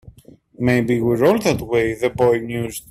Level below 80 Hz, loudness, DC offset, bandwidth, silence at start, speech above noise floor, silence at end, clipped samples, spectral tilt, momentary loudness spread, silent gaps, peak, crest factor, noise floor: -46 dBFS; -18 LUFS; under 0.1%; 16 kHz; 0.05 s; 29 dB; 0.1 s; under 0.1%; -6 dB/octave; 7 LU; none; -2 dBFS; 16 dB; -47 dBFS